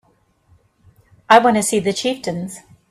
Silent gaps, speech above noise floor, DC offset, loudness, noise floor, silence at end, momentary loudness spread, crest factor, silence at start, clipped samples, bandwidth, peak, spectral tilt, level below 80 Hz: none; 43 dB; under 0.1%; -16 LUFS; -59 dBFS; 0.35 s; 18 LU; 20 dB; 1.3 s; under 0.1%; 14.5 kHz; 0 dBFS; -3.5 dB/octave; -58 dBFS